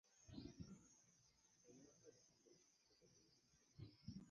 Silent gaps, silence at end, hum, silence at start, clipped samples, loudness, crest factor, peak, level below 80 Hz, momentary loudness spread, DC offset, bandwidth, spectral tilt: none; 0 s; none; 0.05 s; under 0.1%; -63 LUFS; 22 dB; -44 dBFS; -78 dBFS; 9 LU; under 0.1%; 9.6 kHz; -5.5 dB/octave